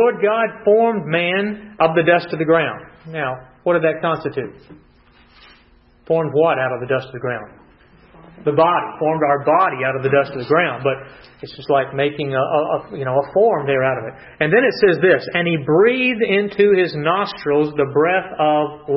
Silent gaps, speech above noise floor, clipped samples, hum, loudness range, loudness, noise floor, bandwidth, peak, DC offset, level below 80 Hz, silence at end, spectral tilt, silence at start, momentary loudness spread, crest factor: none; 34 dB; under 0.1%; none; 7 LU; -17 LUFS; -52 dBFS; 5.8 kHz; -2 dBFS; under 0.1%; -56 dBFS; 0 s; -9.5 dB/octave; 0 s; 11 LU; 16 dB